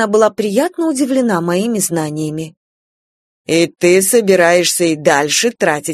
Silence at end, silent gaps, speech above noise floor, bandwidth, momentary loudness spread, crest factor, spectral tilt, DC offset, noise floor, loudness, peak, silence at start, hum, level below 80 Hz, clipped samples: 0 s; 2.57-3.45 s; over 76 dB; 14 kHz; 10 LU; 14 dB; -3.5 dB/octave; under 0.1%; under -90 dBFS; -13 LUFS; 0 dBFS; 0 s; none; -60 dBFS; under 0.1%